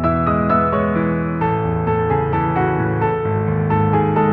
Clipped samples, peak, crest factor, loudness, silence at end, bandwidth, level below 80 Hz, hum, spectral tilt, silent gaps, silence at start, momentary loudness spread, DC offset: under 0.1%; -4 dBFS; 12 dB; -18 LUFS; 0 s; 4.3 kHz; -36 dBFS; none; -11.5 dB/octave; none; 0 s; 3 LU; under 0.1%